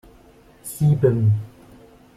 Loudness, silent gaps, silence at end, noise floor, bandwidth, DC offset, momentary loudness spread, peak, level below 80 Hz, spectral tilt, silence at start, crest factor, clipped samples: -20 LUFS; none; 0.7 s; -50 dBFS; 14.5 kHz; under 0.1%; 20 LU; -6 dBFS; -48 dBFS; -8.5 dB/octave; 0.65 s; 16 dB; under 0.1%